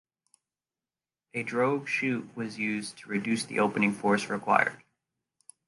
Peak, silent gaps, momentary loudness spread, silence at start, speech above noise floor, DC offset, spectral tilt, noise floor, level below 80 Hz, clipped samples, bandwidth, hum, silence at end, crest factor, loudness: -6 dBFS; none; 9 LU; 1.35 s; over 61 dB; under 0.1%; -5 dB/octave; under -90 dBFS; -74 dBFS; under 0.1%; 11.5 kHz; none; 0.9 s; 24 dB; -29 LUFS